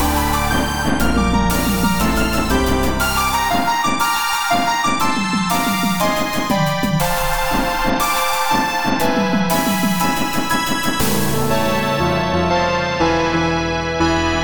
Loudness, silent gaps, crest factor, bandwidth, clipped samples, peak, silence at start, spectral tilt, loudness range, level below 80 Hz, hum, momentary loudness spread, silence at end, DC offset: -17 LUFS; none; 14 dB; over 20 kHz; under 0.1%; -4 dBFS; 0 s; -4 dB/octave; 1 LU; -30 dBFS; none; 2 LU; 0 s; under 0.1%